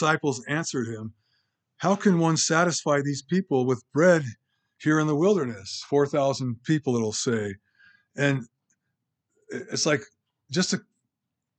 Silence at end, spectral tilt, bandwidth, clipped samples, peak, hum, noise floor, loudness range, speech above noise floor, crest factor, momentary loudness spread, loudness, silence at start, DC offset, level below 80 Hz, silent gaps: 0.8 s; -5 dB/octave; 9.2 kHz; under 0.1%; -6 dBFS; none; -84 dBFS; 6 LU; 59 dB; 20 dB; 13 LU; -25 LUFS; 0 s; under 0.1%; -76 dBFS; none